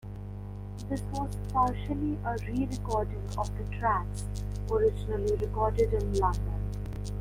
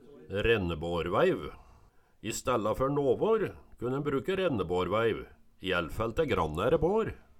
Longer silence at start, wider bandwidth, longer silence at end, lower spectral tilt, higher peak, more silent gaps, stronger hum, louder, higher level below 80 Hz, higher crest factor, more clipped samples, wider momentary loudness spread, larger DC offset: about the same, 0.05 s vs 0.1 s; about the same, 15.5 kHz vs 17 kHz; second, 0 s vs 0.2 s; first, -7.5 dB/octave vs -5.5 dB/octave; about the same, -14 dBFS vs -12 dBFS; neither; first, 50 Hz at -35 dBFS vs none; about the same, -31 LUFS vs -30 LUFS; first, -36 dBFS vs -48 dBFS; about the same, 16 dB vs 18 dB; neither; about the same, 9 LU vs 10 LU; neither